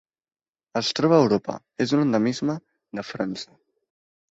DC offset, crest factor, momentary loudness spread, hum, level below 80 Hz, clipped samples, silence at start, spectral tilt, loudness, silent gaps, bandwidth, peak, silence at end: under 0.1%; 20 dB; 17 LU; none; -64 dBFS; under 0.1%; 0.75 s; -6 dB/octave; -23 LUFS; none; 8 kHz; -6 dBFS; 0.85 s